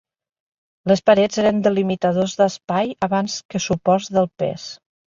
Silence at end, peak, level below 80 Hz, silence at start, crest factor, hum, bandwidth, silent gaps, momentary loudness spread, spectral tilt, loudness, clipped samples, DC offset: 0.3 s; -2 dBFS; -56 dBFS; 0.85 s; 18 dB; none; 7.6 kHz; 2.64-2.68 s, 3.45-3.49 s; 10 LU; -5.5 dB/octave; -19 LUFS; under 0.1%; under 0.1%